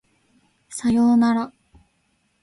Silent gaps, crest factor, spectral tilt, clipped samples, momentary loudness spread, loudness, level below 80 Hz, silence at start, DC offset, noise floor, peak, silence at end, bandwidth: none; 12 dB; -5.5 dB/octave; under 0.1%; 17 LU; -19 LUFS; -56 dBFS; 0.7 s; under 0.1%; -67 dBFS; -10 dBFS; 0.95 s; 11.5 kHz